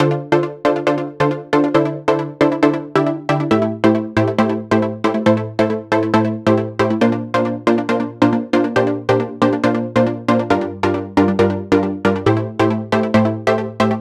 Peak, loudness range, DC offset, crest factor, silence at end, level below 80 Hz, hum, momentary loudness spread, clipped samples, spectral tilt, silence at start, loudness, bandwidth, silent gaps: 0 dBFS; 0 LU; under 0.1%; 16 dB; 0 s; -50 dBFS; none; 4 LU; under 0.1%; -7.5 dB/octave; 0 s; -17 LUFS; 11 kHz; none